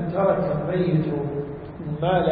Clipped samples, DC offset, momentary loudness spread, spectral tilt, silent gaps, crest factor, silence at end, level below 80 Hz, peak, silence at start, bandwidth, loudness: under 0.1%; under 0.1%; 11 LU; -12.5 dB/octave; none; 16 dB; 0 s; -46 dBFS; -8 dBFS; 0 s; 4.9 kHz; -24 LUFS